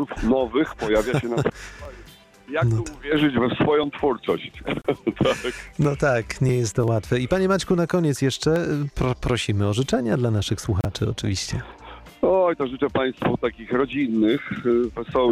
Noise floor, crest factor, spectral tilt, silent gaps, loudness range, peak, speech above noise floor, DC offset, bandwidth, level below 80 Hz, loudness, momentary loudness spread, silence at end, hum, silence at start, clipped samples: -47 dBFS; 12 dB; -6 dB/octave; none; 2 LU; -10 dBFS; 25 dB; under 0.1%; 15 kHz; -42 dBFS; -23 LUFS; 7 LU; 0 s; none; 0 s; under 0.1%